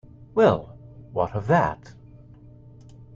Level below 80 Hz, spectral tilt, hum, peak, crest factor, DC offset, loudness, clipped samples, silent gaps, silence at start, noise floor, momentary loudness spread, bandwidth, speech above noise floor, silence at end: -52 dBFS; -8 dB/octave; none; -6 dBFS; 20 dB; under 0.1%; -23 LUFS; under 0.1%; none; 0.2 s; -47 dBFS; 16 LU; 7.4 kHz; 26 dB; 1.4 s